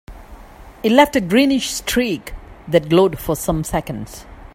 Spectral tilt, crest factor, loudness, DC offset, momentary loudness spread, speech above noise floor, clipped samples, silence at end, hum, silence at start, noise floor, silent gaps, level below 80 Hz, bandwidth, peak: -4.5 dB/octave; 18 dB; -17 LUFS; under 0.1%; 18 LU; 22 dB; under 0.1%; 0.05 s; none; 0.1 s; -39 dBFS; none; -38 dBFS; 16.5 kHz; 0 dBFS